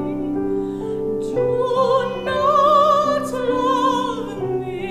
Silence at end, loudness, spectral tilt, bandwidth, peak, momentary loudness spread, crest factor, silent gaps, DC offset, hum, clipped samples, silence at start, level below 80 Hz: 0 s; -19 LUFS; -6 dB/octave; 15 kHz; -4 dBFS; 11 LU; 14 dB; none; under 0.1%; none; under 0.1%; 0 s; -46 dBFS